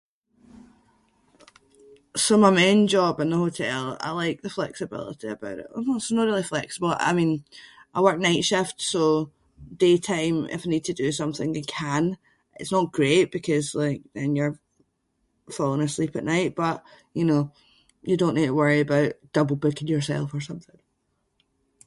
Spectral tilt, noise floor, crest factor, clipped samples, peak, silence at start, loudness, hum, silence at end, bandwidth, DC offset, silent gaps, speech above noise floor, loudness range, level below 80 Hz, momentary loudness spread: -5 dB/octave; -73 dBFS; 20 dB; under 0.1%; -4 dBFS; 2.15 s; -24 LUFS; none; 1.25 s; 11.5 kHz; under 0.1%; none; 50 dB; 5 LU; -62 dBFS; 13 LU